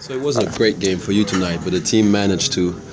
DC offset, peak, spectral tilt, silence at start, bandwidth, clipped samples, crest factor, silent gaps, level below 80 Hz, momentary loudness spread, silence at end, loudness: under 0.1%; -2 dBFS; -4.5 dB/octave; 0 s; 8 kHz; under 0.1%; 16 dB; none; -42 dBFS; 5 LU; 0 s; -18 LUFS